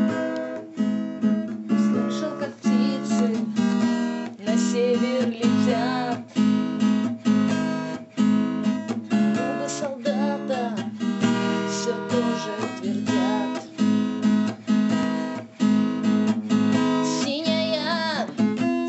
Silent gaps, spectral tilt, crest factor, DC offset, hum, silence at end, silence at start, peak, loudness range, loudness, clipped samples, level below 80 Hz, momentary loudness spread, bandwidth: none; -5.5 dB/octave; 14 dB; under 0.1%; none; 0 s; 0 s; -8 dBFS; 2 LU; -24 LUFS; under 0.1%; -70 dBFS; 6 LU; 8.4 kHz